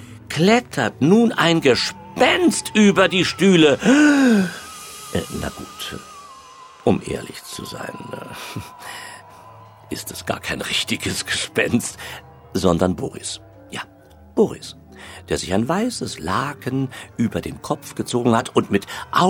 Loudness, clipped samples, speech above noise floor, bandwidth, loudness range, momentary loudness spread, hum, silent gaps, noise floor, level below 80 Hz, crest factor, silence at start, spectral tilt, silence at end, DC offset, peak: -19 LUFS; under 0.1%; 27 dB; 17.5 kHz; 12 LU; 20 LU; none; none; -47 dBFS; -48 dBFS; 18 dB; 0 s; -4.5 dB/octave; 0 s; under 0.1%; -4 dBFS